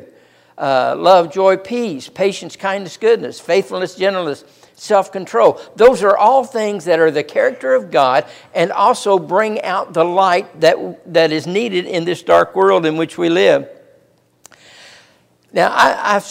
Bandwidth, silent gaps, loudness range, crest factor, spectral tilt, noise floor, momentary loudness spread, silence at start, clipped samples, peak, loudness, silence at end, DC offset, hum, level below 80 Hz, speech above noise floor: 15.5 kHz; none; 4 LU; 16 dB; -4.5 dB/octave; -54 dBFS; 10 LU; 0.6 s; under 0.1%; 0 dBFS; -15 LUFS; 0 s; under 0.1%; none; -58 dBFS; 40 dB